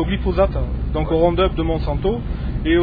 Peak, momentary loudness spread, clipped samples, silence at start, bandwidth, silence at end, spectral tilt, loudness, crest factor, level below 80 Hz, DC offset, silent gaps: -4 dBFS; 7 LU; under 0.1%; 0 s; 5 kHz; 0 s; -10.5 dB/octave; -20 LUFS; 14 dB; -24 dBFS; 0.4%; none